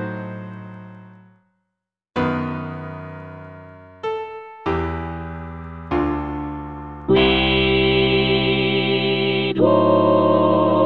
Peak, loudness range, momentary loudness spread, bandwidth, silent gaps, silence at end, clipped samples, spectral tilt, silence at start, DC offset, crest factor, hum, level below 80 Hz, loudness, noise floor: -4 dBFS; 13 LU; 19 LU; 5.4 kHz; none; 0 s; under 0.1%; -8.5 dB/octave; 0 s; under 0.1%; 18 dB; none; -38 dBFS; -19 LUFS; -80 dBFS